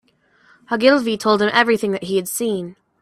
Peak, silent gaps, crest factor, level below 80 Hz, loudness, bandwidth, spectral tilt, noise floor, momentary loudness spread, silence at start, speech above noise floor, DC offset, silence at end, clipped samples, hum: 0 dBFS; none; 18 dB; -62 dBFS; -18 LUFS; 15.5 kHz; -4 dB/octave; -56 dBFS; 10 LU; 0.7 s; 39 dB; under 0.1%; 0.3 s; under 0.1%; none